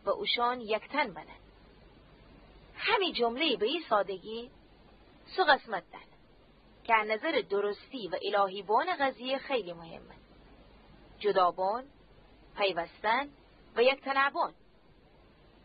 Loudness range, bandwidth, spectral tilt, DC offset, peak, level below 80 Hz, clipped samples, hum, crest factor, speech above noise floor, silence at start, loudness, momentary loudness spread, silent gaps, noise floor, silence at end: 3 LU; 5 kHz; -7 dB/octave; under 0.1%; -10 dBFS; -64 dBFS; under 0.1%; none; 22 dB; 31 dB; 0.05 s; -30 LUFS; 16 LU; none; -61 dBFS; 1.15 s